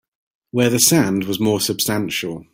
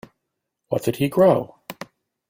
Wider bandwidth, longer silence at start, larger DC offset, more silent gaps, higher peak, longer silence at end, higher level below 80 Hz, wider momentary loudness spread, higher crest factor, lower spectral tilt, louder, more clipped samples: about the same, 16.5 kHz vs 16.5 kHz; second, 0.55 s vs 0.7 s; neither; neither; first, 0 dBFS vs -4 dBFS; second, 0.1 s vs 0.55 s; first, -54 dBFS vs -60 dBFS; second, 10 LU vs 21 LU; about the same, 20 dB vs 20 dB; second, -3.5 dB/octave vs -7 dB/octave; first, -17 LUFS vs -20 LUFS; neither